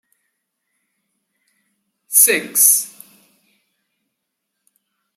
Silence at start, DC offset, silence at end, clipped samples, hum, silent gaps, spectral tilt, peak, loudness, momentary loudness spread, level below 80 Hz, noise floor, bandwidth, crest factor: 2.1 s; under 0.1%; 2.3 s; under 0.1%; none; none; 0.5 dB/octave; 0 dBFS; -12 LUFS; 6 LU; -80 dBFS; -77 dBFS; 16.5 kHz; 22 dB